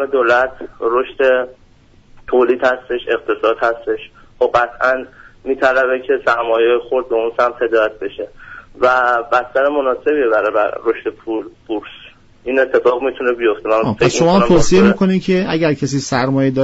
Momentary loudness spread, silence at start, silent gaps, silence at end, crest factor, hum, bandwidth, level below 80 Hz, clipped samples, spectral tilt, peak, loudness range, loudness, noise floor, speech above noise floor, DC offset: 12 LU; 0 s; none; 0 s; 14 dB; none; 8 kHz; -38 dBFS; under 0.1%; -4.5 dB/octave; -2 dBFS; 4 LU; -15 LUFS; -47 dBFS; 32 dB; under 0.1%